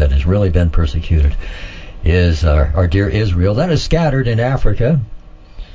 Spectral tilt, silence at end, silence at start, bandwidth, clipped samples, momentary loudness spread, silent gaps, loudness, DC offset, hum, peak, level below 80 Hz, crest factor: -7.5 dB/octave; 0.1 s; 0 s; 7.6 kHz; under 0.1%; 8 LU; none; -15 LUFS; under 0.1%; none; 0 dBFS; -18 dBFS; 14 dB